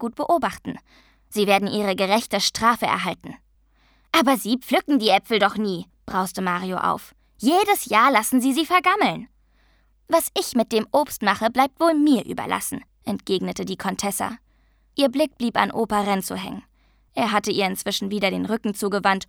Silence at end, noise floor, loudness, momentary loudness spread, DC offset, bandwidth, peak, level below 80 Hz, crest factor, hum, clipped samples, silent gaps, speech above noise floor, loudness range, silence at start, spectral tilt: 0.05 s; -60 dBFS; -22 LUFS; 12 LU; under 0.1%; over 20 kHz; -2 dBFS; -56 dBFS; 22 dB; none; under 0.1%; none; 38 dB; 4 LU; 0 s; -4 dB/octave